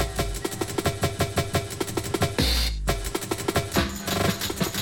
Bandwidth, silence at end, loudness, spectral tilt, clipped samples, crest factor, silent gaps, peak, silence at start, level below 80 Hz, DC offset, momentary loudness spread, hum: 17 kHz; 0 s; -26 LUFS; -4 dB/octave; under 0.1%; 18 dB; none; -8 dBFS; 0 s; -34 dBFS; under 0.1%; 6 LU; none